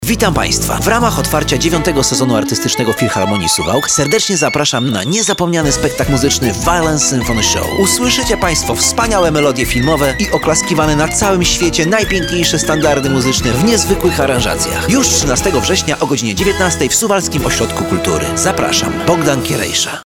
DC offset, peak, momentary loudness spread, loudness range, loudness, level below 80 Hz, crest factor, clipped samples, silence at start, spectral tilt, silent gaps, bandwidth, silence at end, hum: 0.1%; 0 dBFS; 3 LU; 1 LU; -12 LUFS; -28 dBFS; 12 dB; under 0.1%; 0 s; -3.5 dB/octave; none; 19 kHz; 0 s; none